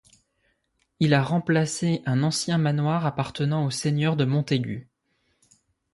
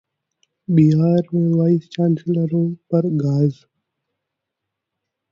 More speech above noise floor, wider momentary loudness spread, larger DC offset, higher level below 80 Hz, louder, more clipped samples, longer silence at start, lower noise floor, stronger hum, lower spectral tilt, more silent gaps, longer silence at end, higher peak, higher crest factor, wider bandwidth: second, 48 dB vs 64 dB; about the same, 5 LU vs 6 LU; neither; about the same, -60 dBFS vs -58 dBFS; second, -24 LUFS vs -18 LUFS; neither; first, 1 s vs 0.7 s; second, -72 dBFS vs -81 dBFS; neither; second, -6 dB/octave vs -10.5 dB/octave; neither; second, 1.1 s vs 1.8 s; second, -8 dBFS vs -4 dBFS; about the same, 18 dB vs 16 dB; first, 11.5 kHz vs 7 kHz